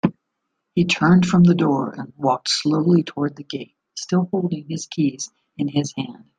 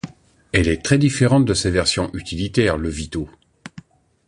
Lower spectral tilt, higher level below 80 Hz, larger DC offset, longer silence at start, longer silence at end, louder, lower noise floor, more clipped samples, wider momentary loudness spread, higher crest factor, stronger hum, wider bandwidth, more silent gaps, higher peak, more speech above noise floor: about the same, -6 dB/octave vs -5 dB/octave; second, -58 dBFS vs -36 dBFS; neither; about the same, 0.05 s vs 0.05 s; second, 0.2 s vs 0.5 s; about the same, -20 LUFS vs -19 LUFS; first, -77 dBFS vs -44 dBFS; neither; second, 17 LU vs 20 LU; about the same, 18 dB vs 18 dB; neither; second, 9.4 kHz vs 11.5 kHz; neither; about the same, -2 dBFS vs -2 dBFS; first, 57 dB vs 26 dB